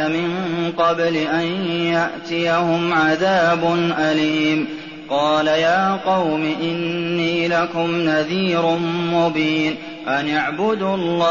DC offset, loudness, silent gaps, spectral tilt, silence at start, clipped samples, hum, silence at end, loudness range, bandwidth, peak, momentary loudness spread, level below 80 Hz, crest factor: 0.2%; -19 LUFS; none; -3.5 dB/octave; 0 s; under 0.1%; none; 0 s; 2 LU; 7.2 kHz; -6 dBFS; 6 LU; -56 dBFS; 12 dB